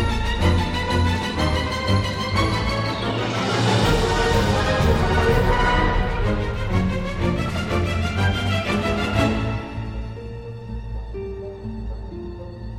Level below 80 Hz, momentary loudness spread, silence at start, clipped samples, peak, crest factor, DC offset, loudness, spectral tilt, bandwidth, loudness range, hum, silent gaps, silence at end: -28 dBFS; 14 LU; 0 s; under 0.1%; -4 dBFS; 16 dB; under 0.1%; -21 LUFS; -5.5 dB/octave; 16 kHz; 7 LU; none; none; 0 s